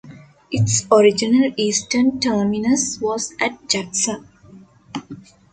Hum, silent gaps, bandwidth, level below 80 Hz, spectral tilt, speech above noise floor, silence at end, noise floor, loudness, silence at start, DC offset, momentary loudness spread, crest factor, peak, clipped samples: none; none; 9.6 kHz; -54 dBFS; -4 dB/octave; 28 dB; 0.35 s; -46 dBFS; -18 LUFS; 0.05 s; under 0.1%; 17 LU; 18 dB; -2 dBFS; under 0.1%